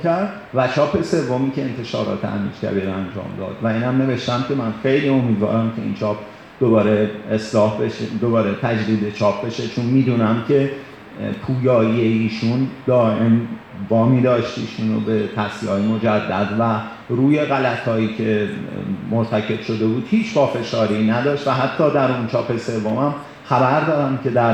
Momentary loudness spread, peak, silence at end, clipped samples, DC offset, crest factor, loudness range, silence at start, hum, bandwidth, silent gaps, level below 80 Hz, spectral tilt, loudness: 8 LU; -4 dBFS; 0 s; under 0.1%; under 0.1%; 16 dB; 2 LU; 0 s; none; 8.8 kHz; none; -56 dBFS; -7.5 dB/octave; -19 LUFS